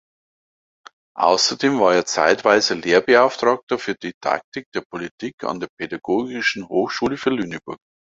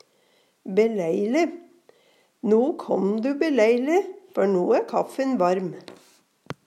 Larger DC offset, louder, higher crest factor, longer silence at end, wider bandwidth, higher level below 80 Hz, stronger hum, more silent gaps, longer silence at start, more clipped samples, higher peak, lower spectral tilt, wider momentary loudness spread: neither; first, -20 LUFS vs -23 LUFS; about the same, 20 dB vs 16 dB; first, 0.35 s vs 0.15 s; second, 7.8 kHz vs 13 kHz; first, -60 dBFS vs -76 dBFS; neither; first, 3.63-3.67 s, 4.14-4.21 s, 4.44-4.52 s, 4.66-4.72 s, 4.85-4.90 s, 5.11-5.18 s, 5.33-5.38 s, 5.69-5.77 s vs none; first, 1.15 s vs 0.65 s; neither; first, -2 dBFS vs -8 dBFS; second, -3 dB/octave vs -6.5 dB/octave; first, 14 LU vs 11 LU